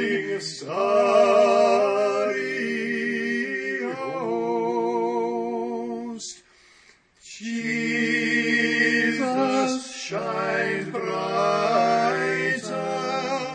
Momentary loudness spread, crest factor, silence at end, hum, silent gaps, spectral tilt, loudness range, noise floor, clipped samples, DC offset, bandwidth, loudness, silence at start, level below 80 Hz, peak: 11 LU; 16 dB; 0 s; none; none; -4 dB/octave; 7 LU; -56 dBFS; under 0.1%; under 0.1%; 10 kHz; -23 LUFS; 0 s; -72 dBFS; -8 dBFS